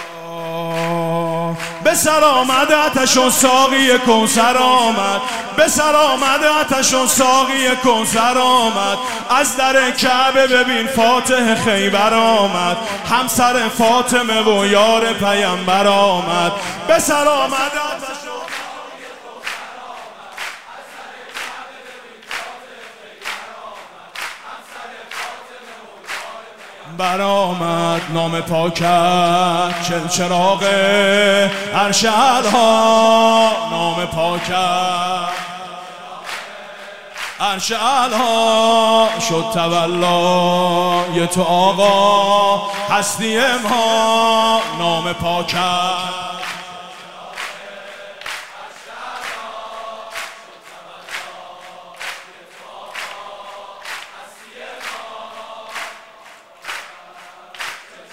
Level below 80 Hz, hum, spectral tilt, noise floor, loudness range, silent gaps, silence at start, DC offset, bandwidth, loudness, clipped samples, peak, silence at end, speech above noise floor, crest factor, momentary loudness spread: -52 dBFS; none; -3 dB/octave; -42 dBFS; 18 LU; none; 0 s; 0.9%; 16 kHz; -14 LUFS; under 0.1%; 0 dBFS; 0 s; 28 dB; 16 dB; 21 LU